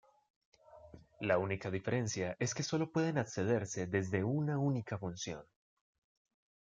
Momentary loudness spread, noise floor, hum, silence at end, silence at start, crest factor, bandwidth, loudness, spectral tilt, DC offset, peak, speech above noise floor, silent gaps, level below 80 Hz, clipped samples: 8 LU; -57 dBFS; none; 1.3 s; 0.7 s; 22 dB; 9.4 kHz; -36 LUFS; -5.5 dB/octave; under 0.1%; -16 dBFS; 22 dB; none; -72 dBFS; under 0.1%